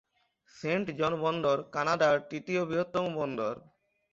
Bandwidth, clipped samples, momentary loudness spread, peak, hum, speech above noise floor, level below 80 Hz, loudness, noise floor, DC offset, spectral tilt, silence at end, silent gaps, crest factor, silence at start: 7.6 kHz; under 0.1%; 8 LU; -14 dBFS; none; 38 dB; -68 dBFS; -30 LUFS; -68 dBFS; under 0.1%; -6 dB/octave; 0.55 s; none; 18 dB; 0.55 s